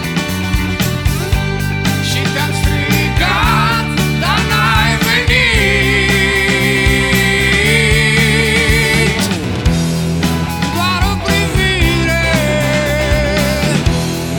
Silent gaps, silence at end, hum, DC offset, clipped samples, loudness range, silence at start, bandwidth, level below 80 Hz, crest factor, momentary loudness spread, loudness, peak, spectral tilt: none; 0 s; none; under 0.1%; under 0.1%; 3 LU; 0 s; over 20 kHz; -22 dBFS; 12 dB; 6 LU; -12 LUFS; 0 dBFS; -4.5 dB/octave